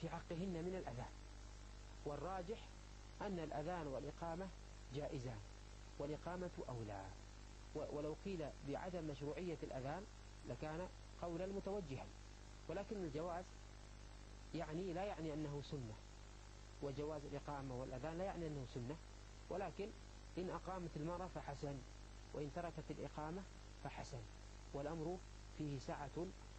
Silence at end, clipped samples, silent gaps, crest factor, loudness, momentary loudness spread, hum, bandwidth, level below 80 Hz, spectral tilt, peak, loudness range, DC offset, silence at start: 0 s; under 0.1%; none; 16 dB; -50 LUFS; 13 LU; 50 Hz at -60 dBFS; 8.8 kHz; -58 dBFS; -6.5 dB/octave; -32 dBFS; 2 LU; under 0.1%; 0 s